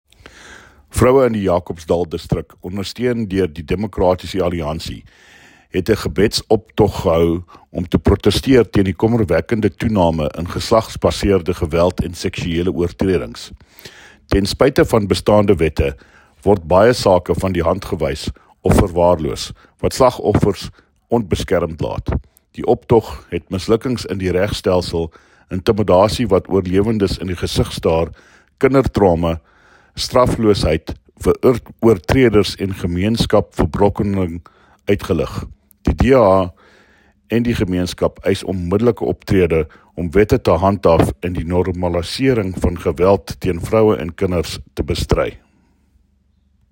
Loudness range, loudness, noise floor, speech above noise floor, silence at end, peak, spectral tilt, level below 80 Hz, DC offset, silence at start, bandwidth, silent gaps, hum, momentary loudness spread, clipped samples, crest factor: 3 LU; -17 LUFS; -58 dBFS; 42 dB; 1.35 s; 0 dBFS; -6.5 dB/octave; -32 dBFS; under 0.1%; 0.45 s; 16.5 kHz; none; none; 11 LU; under 0.1%; 16 dB